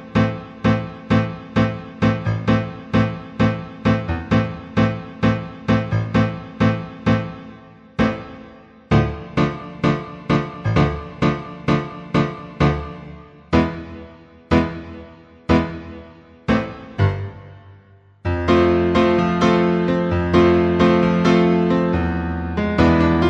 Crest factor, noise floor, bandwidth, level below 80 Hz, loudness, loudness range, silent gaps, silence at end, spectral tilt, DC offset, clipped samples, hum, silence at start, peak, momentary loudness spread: 16 dB; -49 dBFS; 8 kHz; -36 dBFS; -19 LUFS; 7 LU; none; 0 s; -8 dB/octave; under 0.1%; under 0.1%; none; 0 s; -2 dBFS; 15 LU